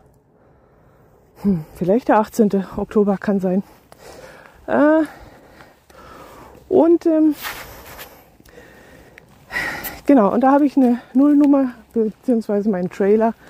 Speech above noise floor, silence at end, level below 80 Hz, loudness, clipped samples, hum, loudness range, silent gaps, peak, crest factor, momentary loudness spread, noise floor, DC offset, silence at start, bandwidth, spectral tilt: 37 dB; 0.2 s; -50 dBFS; -17 LUFS; under 0.1%; none; 6 LU; none; -2 dBFS; 18 dB; 13 LU; -53 dBFS; under 0.1%; 1.4 s; 16 kHz; -7.5 dB/octave